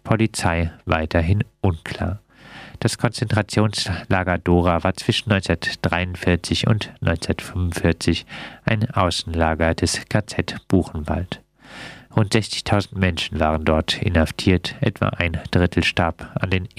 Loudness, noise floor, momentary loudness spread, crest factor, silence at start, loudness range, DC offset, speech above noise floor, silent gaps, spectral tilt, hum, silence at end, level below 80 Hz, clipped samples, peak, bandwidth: -21 LUFS; -42 dBFS; 7 LU; 20 dB; 0.05 s; 3 LU; under 0.1%; 21 dB; none; -5.5 dB/octave; none; 0.1 s; -36 dBFS; under 0.1%; 0 dBFS; 14 kHz